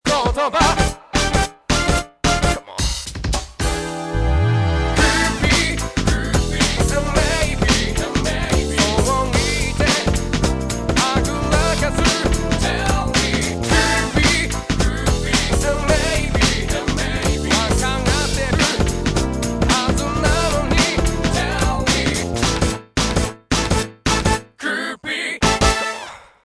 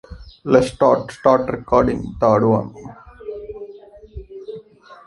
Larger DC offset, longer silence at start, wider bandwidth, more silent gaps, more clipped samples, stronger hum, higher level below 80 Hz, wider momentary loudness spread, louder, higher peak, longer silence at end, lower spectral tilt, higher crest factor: neither; about the same, 0.05 s vs 0.1 s; about the same, 11 kHz vs 11.5 kHz; neither; neither; neither; first, -24 dBFS vs -42 dBFS; second, 6 LU vs 22 LU; about the same, -18 LUFS vs -17 LUFS; about the same, 0 dBFS vs -2 dBFS; first, 0.3 s vs 0.15 s; second, -4 dB/octave vs -7.5 dB/octave; about the same, 18 dB vs 18 dB